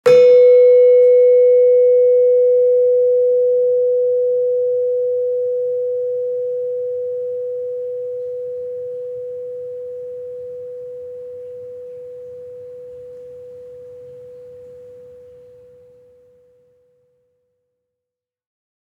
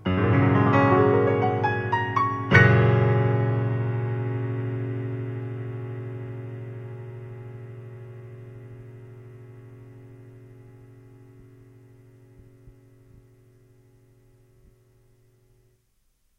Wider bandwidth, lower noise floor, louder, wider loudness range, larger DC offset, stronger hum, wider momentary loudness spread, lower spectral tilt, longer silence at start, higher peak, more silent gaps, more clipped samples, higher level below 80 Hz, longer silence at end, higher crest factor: second, 5.6 kHz vs 6.2 kHz; first, -85 dBFS vs -67 dBFS; first, -15 LUFS vs -23 LUFS; about the same, 24 LU vs 25 LU; neither; neither; about the same, 25 LU vs 25 LU; second, -5 dB/octave vs -8.5 dB/octave; about the same, 0.05 s vs 0 s; about the same, -2 dBFS vs 0 dBFS; neither; neither; second, -70 dBFS vs -56 dBFS; about the same, 3.75 s vs 3.7 s; second, 16 dB vs 26 dB